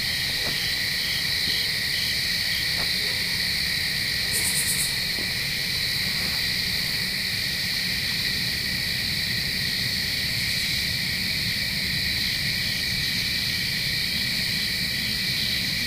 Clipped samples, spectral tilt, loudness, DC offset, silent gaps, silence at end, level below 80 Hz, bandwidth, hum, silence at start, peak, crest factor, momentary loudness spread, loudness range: under 0.1%; -1.5 dB/octave; -23 LUFS; under 0.1%; none; 0 s; -44 dBFS; 16 kHz; none; 0 s; -8 dBFS; 16 dB; 2 LU; 1 LU